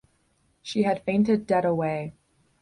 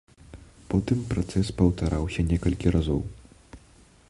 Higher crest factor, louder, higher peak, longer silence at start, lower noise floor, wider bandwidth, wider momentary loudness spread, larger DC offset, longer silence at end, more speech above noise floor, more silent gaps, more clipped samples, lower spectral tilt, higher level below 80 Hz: about the same, 16 dB vs 20 dB; about the same, -25 LUFS vs -26 LUFS; second, -10 dBFS vs -6 dBFS; first, 0.65 s vs 0.35 s; first, -67 dBFS vs -55 dBFS; about the same, 10.5 kHz vs 11.5 kHz; first, 12 LU vs 5 LU; neither; about the same, 0.5 s vs 0.5 s; first, 44 dB vs 31 dB; neither; neither; about the same, -7 dB/octave vs -7.5 dB/octave; second, -62 dBFS vs -36 dBFS